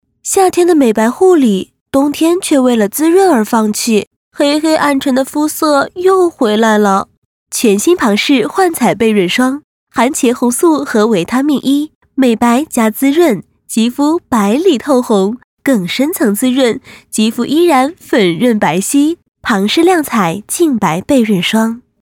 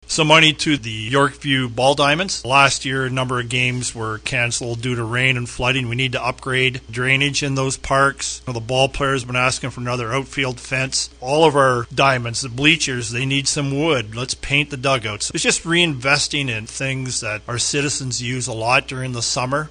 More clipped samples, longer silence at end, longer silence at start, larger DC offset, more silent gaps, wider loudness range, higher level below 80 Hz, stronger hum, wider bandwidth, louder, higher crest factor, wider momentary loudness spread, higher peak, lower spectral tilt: neither; first, 0.25 s vs 0 s; first, 0.25 s vs 0.1 s; neither; first, 1.81-1.86 s, 4.07-4.31 s, 7.18-7.46 s, 9.64-9.87 s, 11.95-12.01 s, 15.44-15.57 s vs none; about the same, 2 LU vs 3 LU; second, -52 dBFS vs -42 dBFS; neither; first, 18 kHz vs 10 kHz; first, -12 LUFS vs -18 LUFS; second, 12 dB vs 20 dB; second, 6 LU vs 9 LU; about the same, 0 dBFS vs 0 dBFS; about the same, -4.5 dB/octave vs -3.5 dB/octave